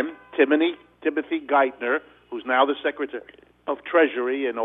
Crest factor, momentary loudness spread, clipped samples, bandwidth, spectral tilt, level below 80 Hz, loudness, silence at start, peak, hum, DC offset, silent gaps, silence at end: 18 dB; 12 LU; under 0.1%; 4 kHz; -6.5 dB/octave; -70 dBFS; -23 LUFS; 0 s; -6 dBFS; 60 Hz at -65 dBFS; under 0.1%; none; 0 s